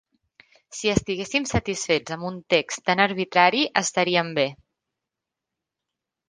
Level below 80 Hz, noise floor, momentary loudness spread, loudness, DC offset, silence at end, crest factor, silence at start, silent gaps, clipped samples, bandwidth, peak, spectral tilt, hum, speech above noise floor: -48 dBFS; -86 dBFS; 9 LU; -23 LUFS; under 0.1%; 1.75 s; 24 dB; 0.7 s; none; under 0.1%; 10 kHz; -2 dBFS; -3.5 dB/octave; none; 63 dB